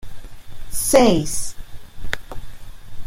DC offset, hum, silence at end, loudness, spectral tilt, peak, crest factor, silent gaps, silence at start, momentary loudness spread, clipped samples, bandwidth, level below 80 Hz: under 0.1%; none; 0 s; -19 LUFS; -4 dB/octave; -2 dBFS; 18 dB; none; 0 s; 25 LU; under 0.1%; 16.5 kHz; -34 dBFS